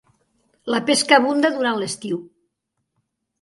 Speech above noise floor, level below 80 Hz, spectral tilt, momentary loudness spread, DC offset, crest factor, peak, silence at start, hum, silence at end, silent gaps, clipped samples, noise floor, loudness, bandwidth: 57 dB; -70 dBFS; -3 dB/octave; 14 LU; under 0.1%; 22 dB; 0 dBFS; 0.65 s; none; 1.15 s; none; under 0.1%; -76 dBFS; -19 LUFS; 11.5 kHz